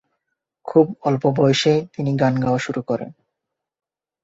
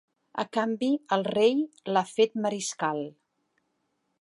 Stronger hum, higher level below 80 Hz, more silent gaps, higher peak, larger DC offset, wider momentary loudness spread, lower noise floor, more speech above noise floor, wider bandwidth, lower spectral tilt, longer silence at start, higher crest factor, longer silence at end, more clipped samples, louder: neither; first, -58 dBFS vs -78 dBFS; neither; first, -2 dBFS vs -10 dBFS; neither; about the same, 10 LU vs 11 LU; first, -82 dBFS vs -76 dBFS; first, 63 dB vs 50 dB; second, 8 kHz vs 11.5 kHz; first, -6.5 dB/octave vs -4.5 dB/octave; first, 0.65 s vs 0.35 s; about the same, 18 dB vs 18 dB; about the same, 1.15 s vs 1.1 s; neither; first, -19 LUFS vs -27 LUFS